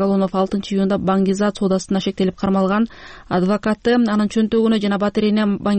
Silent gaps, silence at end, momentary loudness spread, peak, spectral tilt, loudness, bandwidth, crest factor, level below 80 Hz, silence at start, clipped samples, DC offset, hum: none; 0 s; 4 LU; -6 dBFS; -6.5 dB/octave; -18 LUFS; 8.6 kHz; 10 dB; -46 dBFS; 0 s; under 0.1%; under 0.1%; none